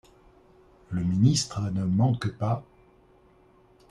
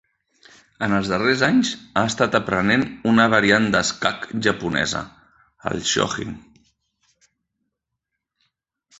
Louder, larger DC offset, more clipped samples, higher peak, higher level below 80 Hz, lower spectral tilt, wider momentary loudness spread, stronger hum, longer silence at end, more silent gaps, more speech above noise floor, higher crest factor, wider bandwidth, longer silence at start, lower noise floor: second, -26 LUFS vs -20 LUFS; neither; neither; second, -10 dBFS vs -2 dBFS; about the same, -56 dBFS vs -52 dBFS; first, -6 dB/octave vs -4 dB/octave; second, 9 LU vs 13 LU; neither; second, 1.3 s vs 2.6 s; neither; second, 34 dB vs 61 dB; about the same, 18 dB vs 22 dB; first, 11.5 kHz vs 8.2 kHz; about the same, 0.9 s vs 0.8 s; second, -58 dBFS vs -81 dBFS